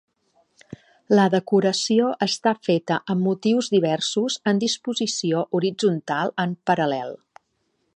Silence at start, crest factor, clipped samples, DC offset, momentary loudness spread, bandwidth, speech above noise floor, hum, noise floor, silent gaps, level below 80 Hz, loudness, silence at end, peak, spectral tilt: 0.7 s; 18 dB; under 0.1%; under 0.1%; 6 LU; 10.5 kHz; 50 dB; none; -71 dBFS; none; -70 dBFS; -22 LUFS; 0.8 s; -6 dBFS; -5 dB/octave